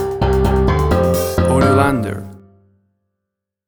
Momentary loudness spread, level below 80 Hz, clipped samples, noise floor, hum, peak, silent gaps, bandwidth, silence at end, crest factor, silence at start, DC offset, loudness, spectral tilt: 12 LU; -26 dBFS; under 0.1%; -80 dBFS; none; 0 dBFS; none; over 20 kHz; 1.3 s; 16 dB; 0 s; under 0.1%; -15 LUFS; -7 dB/octave